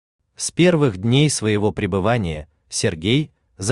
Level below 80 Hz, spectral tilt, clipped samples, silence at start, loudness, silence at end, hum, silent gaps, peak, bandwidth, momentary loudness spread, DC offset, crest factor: -46 dBFS; -5 dB/octave; under 0.1%; 0.4 s; -19 LUFS; 0 s; none; none; -4 dBFS; 12.5 kHz; 11 LU; under 0.1%; 16 dB